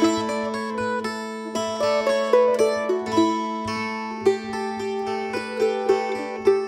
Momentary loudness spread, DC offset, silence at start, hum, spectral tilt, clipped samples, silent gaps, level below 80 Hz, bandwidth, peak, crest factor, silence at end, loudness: 8 LU; under 0.1%; 0 s; none; -4.5 dB/octave; under 0.1%; none; -60 dBFS; 15.5 kHz; -4 dBFS; 18 dB; 0 s; -23 LUFS